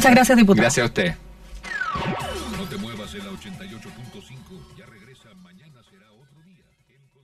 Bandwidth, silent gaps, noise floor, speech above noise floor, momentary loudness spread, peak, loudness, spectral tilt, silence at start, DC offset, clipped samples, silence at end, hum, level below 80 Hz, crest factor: 14 kHz; none; -61 dBFS; 42 dB; 26 LU; -2 dBFS; -20 LUFS; -4.5 dB/octave; 0 s; under 0.1%; under 0.1%; 2.45 s; none; -46 dBFS; 22 dB